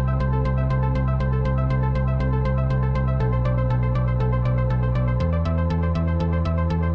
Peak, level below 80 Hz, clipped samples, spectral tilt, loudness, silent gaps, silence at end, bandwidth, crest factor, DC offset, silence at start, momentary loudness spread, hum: -10 dBFS; -26 dBFS; under 0.1%; -10 dB/octave; -22 LUFS; none; 0 s; 5.6 kHz; 10 dB; under 0.1%; 0 s; 1 LU; none